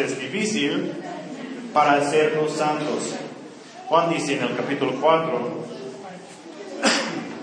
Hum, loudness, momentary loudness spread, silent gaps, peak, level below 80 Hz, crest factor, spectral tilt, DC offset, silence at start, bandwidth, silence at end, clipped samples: none; -22 LUFS; 19 LU; none; -4 dBFS; -76 dBFS; 20 dB; -4 dB/octave; under 0.1%; 0 s; 10.5 kHz; 0 s; under 0.1%